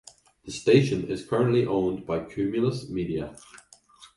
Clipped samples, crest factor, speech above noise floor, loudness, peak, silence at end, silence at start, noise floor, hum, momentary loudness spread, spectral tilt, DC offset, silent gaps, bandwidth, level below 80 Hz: under 0.1%; 20 dB; 29 dB; -26 LUFS; -6 dBFS; 0.1 s; 0.45 s; -54 dBFS; none; 11 LU; -6.5 dB/octave; under 0.1%; none; 11.5 kHz; -54 dBFS